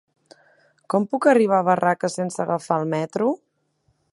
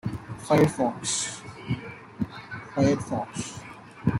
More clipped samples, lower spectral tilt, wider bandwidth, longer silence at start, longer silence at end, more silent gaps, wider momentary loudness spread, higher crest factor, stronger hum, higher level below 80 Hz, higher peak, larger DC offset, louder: neither; about the same, -6 dB/octave vs -5 dB/octave; second, 11.5 kHz vs 16 kHz; first, 0.9 s vs 0.05 s; first, 0.75 s vs 0 s; neither; second, 8 LU vs 17 LU; about the same, 18 dB vs 20 dB; neither; second, -72 dBFS vs -54 dBFS; first, -4 dBFS vs -8 dBFS; neither; first, -21 LUFS vs -27 LUFS